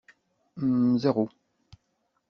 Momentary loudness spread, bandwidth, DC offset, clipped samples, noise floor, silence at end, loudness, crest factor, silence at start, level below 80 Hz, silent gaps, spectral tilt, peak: 10 LU; 6.4 kHz; under 0.1%; under 0.1%; -75 dBFS; 1 s; -26 LUFS; 20 dB; 0.55 s; -66 dBFS; none; -8 dB/octave; -10 dBFS